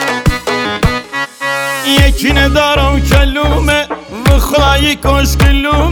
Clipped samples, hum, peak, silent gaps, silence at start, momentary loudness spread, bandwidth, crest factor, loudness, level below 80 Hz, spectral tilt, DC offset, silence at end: under 0.1%; none; 0 dBFS; none; 0 s; 6 LU; 18.5 kHz; 10 dB; -11 LUFS; -14 dBFS; -5 dB/octave; under 0.1%; 0 s